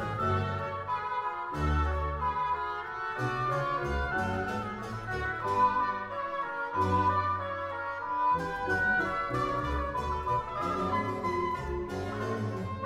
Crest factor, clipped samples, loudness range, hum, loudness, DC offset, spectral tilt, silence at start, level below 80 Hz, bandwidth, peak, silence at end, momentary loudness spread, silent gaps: 16 dB; under 0.1%; 2 LU; none; -31 LUFS; under 0.1%; -6.5 dB/octave; 0 s; -44 dBFS; 14.5 kHz; -16 dBFS; 0 s; 8 LU; none